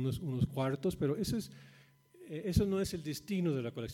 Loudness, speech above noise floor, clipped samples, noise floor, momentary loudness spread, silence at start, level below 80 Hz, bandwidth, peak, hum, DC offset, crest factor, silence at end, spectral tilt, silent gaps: -35 LUFS; 24 dB; under 0.1%; -59 dBFS; 8 LU; 0 s; -52 dBFS; 16.5 kHz; -16 dBFS; none; under 0.1%; 20 dB; 0 s; -6.5 dB/octave; none